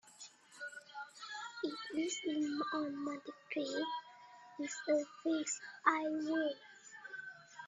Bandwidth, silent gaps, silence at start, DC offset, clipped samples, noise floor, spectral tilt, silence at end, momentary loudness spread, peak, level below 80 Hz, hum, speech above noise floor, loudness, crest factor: 10.5 kHz; none; 0.05 s; under 0.1%; under 0.1%; -59 dBFS; -2 dB/octave; 0 s; 17 LU; -14 dBFS; -90 dBFS; none; 21 dB; -39 LUFS; 26 dB